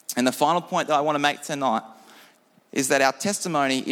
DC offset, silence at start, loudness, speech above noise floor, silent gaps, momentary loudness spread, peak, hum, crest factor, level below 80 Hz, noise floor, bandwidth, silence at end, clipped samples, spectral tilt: under 0.1%; 0.1 s; -23 LUFS; 34 dB; none; 6 LU; -4 dBFS; none; 20 dB; -74 dBFS; -57 dBFS; 18 kHz; 0 s; under 0.1%; -3 dB/octave